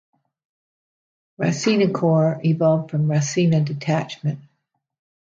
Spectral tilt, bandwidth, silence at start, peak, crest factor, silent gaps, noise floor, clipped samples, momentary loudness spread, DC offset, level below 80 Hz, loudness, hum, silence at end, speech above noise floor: -6.5 dB/octave; 7.6 kHz; 1.4 s; -6 dBFS; 16 dB; none; -73 dBFS; under 0.1%; 8 LU; under 0.1%; -64 dBFS; -20 LUFS; none; 0.8 s; 54 dB